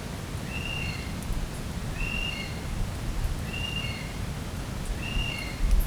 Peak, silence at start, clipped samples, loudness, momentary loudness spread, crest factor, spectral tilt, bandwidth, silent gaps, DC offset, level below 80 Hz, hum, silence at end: -12 dBFS; 0 s; under 0.1%; -32 LUFS; 5 LU; 18 dB; -4.5 dB/octave; over 20 kHz; none; under 0.1%; -32 dBFS; none; 0 s